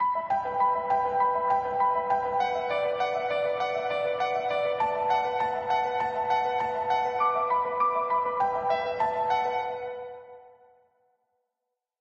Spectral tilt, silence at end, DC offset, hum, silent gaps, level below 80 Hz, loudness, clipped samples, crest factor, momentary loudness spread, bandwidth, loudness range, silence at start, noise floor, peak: -4.5 dB/octave; 1.55 s; under 0.1%; none; none; -64 dBFS; -27 LUFS; under 0.1%; 14 dB; 4 LU; 8 kHz; 3 LU; 0 s; -85 dBFS; -14 dBFS